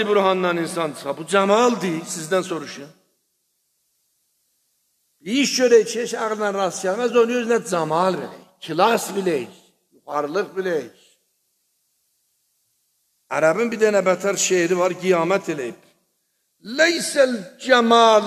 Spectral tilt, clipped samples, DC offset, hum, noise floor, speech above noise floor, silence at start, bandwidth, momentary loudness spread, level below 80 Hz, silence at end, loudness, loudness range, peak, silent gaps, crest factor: -3.5 dB/octave; under 0.1%; under 0.1%; none; -70 dBFS; 51 dB; 0 s; 14 kHz; 13 LU; -76 dBFS; 0 s; -20 LUFS; 10 LU; 0 dBFS; none; 20 dB